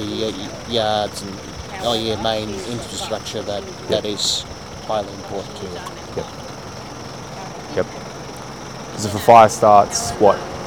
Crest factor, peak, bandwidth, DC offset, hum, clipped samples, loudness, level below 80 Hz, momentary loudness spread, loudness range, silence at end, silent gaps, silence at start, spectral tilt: 20 dB; 0 dBFS; 19 kHz; 0.3%; none; under 0.1%; -19 LUFS; -46 dBFS; 20 LU; 13 LU; 0 s; none; 0 s; -4 dB/octave